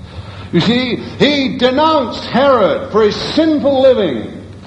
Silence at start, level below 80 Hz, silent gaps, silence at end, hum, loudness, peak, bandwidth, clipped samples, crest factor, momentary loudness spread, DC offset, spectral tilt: 0 s; -40 dBFS; none; 0 s; none; -13 LUFS; 0 dBFS; 8.8 kHz; under 0.1%; 14 dB; 9 LU; under 0.1%; -6 dB/octave